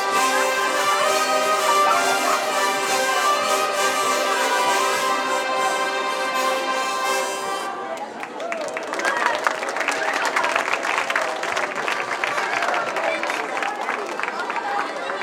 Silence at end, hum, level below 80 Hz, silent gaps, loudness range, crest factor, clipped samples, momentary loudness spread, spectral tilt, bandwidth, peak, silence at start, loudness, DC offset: 0 s; none; -76 dBFS; none; 5 LU; 20 dB; under 0.1%; 7 LU; -0.5 dB/octave; 18.5 kHz; -2 dBFS; 0 s; -21 LUFS; under 0.1%